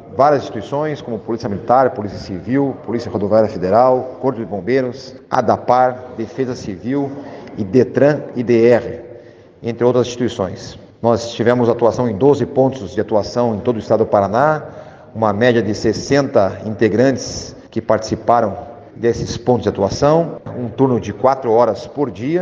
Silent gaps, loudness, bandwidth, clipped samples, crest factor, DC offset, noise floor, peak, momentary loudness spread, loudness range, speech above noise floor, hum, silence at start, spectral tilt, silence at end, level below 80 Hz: none; -17 LUFS; 7.8 kHz; under 0.1%; 16 dB; under 0.1%; -40 dBFS; 0 dBFS; 12 LU; 2 LU; 24 dB; none; 0 s; -6.5 dB/octave; 0 s; -48 dBFS